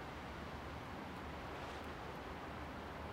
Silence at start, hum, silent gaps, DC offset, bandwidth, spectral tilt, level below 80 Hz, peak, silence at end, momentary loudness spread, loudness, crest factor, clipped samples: 0 s; none; none; under 0.1%; 16 kHz; -5.5 dB/octave; -58 dBFS; -34 dBFS; 0 s; 1 LU; -48 LUFS; 14 dB; under 0.1%